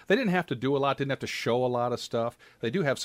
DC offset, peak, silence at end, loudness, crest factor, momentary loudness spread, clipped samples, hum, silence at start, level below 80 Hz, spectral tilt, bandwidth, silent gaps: under 0.1%; -12 dBFS; 0 s; -29 LUFS; 16 dB; 6 LU; under 0.1%; none; 0.1 s; -66 dBFS; -5.5 dB/octave; 16 kHz; none